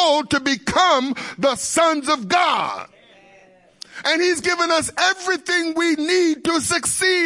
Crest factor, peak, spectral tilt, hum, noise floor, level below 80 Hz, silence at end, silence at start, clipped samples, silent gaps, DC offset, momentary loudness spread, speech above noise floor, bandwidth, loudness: 16 dB; -4 dBFS; -2 dB/octave; none; -51 dBFS; -56 dBFS; 0 s; 0 s; under 0.1%; none; under 0.1%; 5 LU; 32 dB; 11.5 kHz; -19 LUFS